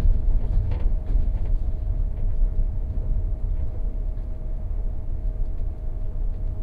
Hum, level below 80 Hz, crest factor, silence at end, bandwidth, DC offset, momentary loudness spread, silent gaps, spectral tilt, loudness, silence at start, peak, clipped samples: none; -22 dBFS; 14 dB; 0 s; 2.2 kHz; under 0.1%; 7 LU; none; -10.5 dB/octave; -30 LUFS; 0 s; -10 dBFS; under 0.1%